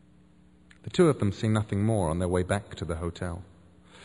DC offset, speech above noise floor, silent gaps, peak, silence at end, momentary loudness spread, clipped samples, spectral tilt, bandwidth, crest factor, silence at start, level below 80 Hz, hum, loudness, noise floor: under 0.1%; 31 dB; none; -10 dBFS; 0 s; 13 LU; under 0.1%; -7 dB/octave; 11 kHz; 18 dB; 0.85 s; -48 dBFS; 60 Hz at -50 dBFS; -28 LUFS; -58 dBFS